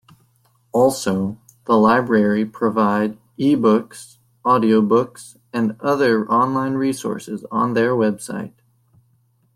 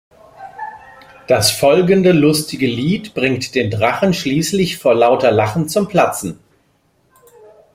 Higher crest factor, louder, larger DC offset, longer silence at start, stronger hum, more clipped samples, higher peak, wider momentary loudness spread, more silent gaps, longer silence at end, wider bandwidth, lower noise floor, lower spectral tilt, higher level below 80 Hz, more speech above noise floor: about the same, 16 dB vs 16 dB; second, -19 LUFS vs -15 LUFS; neither; first, 0.75 s vs 0.4 s; neither; neither; second, -4 dBFS vs 0 dBFS; about the same, 13 LU vs 14 LU; neither; second, 1.1 s vs 1.4 s; about the same, 15 kHz vs 16 kHz; about the same, -61 dBFS vs -59 dBFS; about the same, -6 dB/octave vs -5 dB/octave; second, -60 dBFS vs -50 dBFS; about the same, 43 dB vs 44 dB